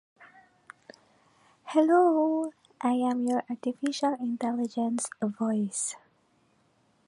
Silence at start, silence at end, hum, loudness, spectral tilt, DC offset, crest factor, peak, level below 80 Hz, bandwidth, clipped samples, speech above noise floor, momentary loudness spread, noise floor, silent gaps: 0.2 s; 1.1 s; none; -28 LUFS; -4.5 dB/octave; under 0.1%; 18 dB; -12 dBFS; -82 dBFS; 11.5 kHz; under 0.1%; 40 dB; 11 LU; -67 dBFS; none